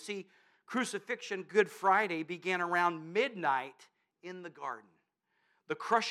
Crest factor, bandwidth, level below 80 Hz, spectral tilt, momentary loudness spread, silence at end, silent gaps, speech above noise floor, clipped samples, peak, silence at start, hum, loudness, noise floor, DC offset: 22 dB; 14 kHz; under -90 dBFS; -4 dB/octave; 17 LU; 0 s; none; 45 dB; under 0.1%; -12 dBFS; 0 s; none; -33 LUFS; -78 dBFS; under 0.1%